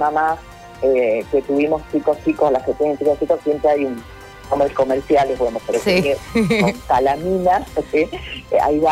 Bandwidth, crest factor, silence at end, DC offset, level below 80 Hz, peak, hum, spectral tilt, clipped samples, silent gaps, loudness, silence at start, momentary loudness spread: 16 kHz; 12 dB; 0 s; under 0.1%; -42 dBFS; -6 dBFS; none; -6 dB/octave; under 0.1%; none; -18 LUFS; 0 s; 5 LU